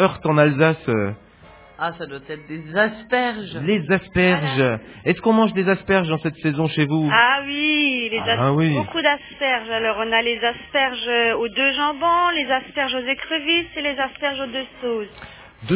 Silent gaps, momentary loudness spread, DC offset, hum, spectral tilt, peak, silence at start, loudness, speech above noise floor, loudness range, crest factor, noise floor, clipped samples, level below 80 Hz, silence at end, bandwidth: none; 10 LU; under 0.1%; none; -9.5 dB/octave; 0 dBFS; 0 s; -20 LUFS; 26 dB; 4 LU; 20 dB; -47 dBFS; under 0.1%; -50 dBFS; 0 s; 4 kHz